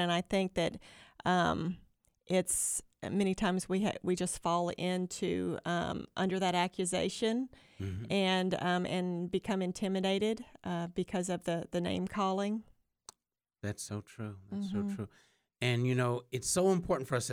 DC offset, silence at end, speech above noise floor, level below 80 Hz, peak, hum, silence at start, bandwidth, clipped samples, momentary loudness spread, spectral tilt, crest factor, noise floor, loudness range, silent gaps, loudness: under 0.1%; 0 s; 53 dB; -60 dBFS; -16 dBFS; none; 0 s; 16 kHz; under 0.1%; 11 LU; -4.5 dB/octave; 18 dB; -86 dBFS; 5 LU; none; -34 LUFS